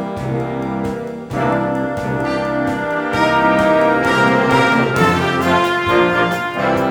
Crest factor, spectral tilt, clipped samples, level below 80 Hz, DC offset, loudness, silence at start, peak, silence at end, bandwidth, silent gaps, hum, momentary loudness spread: 14 dB; -6 dB/octave; under 0.1%; -42 dBFS; under 0.1%; -16 LUFS; 0 s; -2 dBFS; 0 s; over 20 kHz; none; none; 9 LU